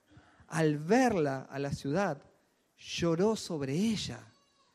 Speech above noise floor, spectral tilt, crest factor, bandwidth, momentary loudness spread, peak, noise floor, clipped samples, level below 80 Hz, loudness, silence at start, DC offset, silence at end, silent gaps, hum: 39 dB; -5.5 dB/octave; 18 dB; 14.5 kHz; 13 LU; -16 dBFS; -70 dBFS; under 0.1%; -62 dBFS; -31 LUFS; 0.5 s; under 0.1%; 0.5 s; none; none